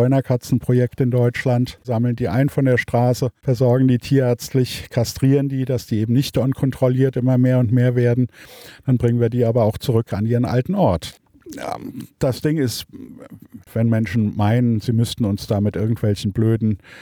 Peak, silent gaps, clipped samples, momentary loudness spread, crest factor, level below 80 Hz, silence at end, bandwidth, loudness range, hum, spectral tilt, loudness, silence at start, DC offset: -4 dBFS; none; under 0.1%; 8 LU; 14 dB; -46 dBFS; 0 s; 17 kHz; 4 LU; none; -7.5 dB/octave; -19 LUFS; 0 s; under 0.1%